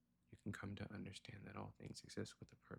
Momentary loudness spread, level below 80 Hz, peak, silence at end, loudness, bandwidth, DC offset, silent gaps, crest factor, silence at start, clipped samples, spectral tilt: 5 LU; -74 dBFS; -34 dBFS; 0 s; -54 LUFS; 16 kHz; under 0.1%; none; 20 dB; 0.3 s; under 0.1%; -5.5 dB/octave